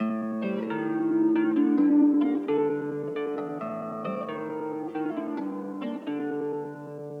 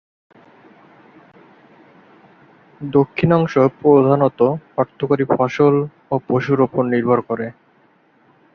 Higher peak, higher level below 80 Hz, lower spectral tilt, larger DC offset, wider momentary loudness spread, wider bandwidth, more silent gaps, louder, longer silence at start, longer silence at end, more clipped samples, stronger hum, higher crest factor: second, -12 dBFS vs -2 dBFS; second, -86 dBFS vs -56 dBFS; about the same, -9 dB/octave vs -9 dB/octave; neither; about the same, 12 LU vs 10 LU; second, 4.2 kHz vs 6.6 kHz; neither; second, -28 LUFS vs -17 LUFS; second, 0 s vs 2.8 s; second, 0 s vs 1.05 s; neither; neither; about the same, 14 dB vs 18 dB